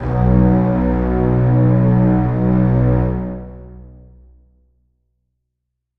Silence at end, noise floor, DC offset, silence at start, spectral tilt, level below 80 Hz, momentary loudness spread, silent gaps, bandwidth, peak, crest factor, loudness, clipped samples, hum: 2.1 s; -77 dBFS; under 0.1%; 0 s; -12.5 dB/octave; -26 dBFS; 10 LU; none; 3.2 kHz; 0 dBFS; 16 dB; -15 LUFS; under 0.1%; none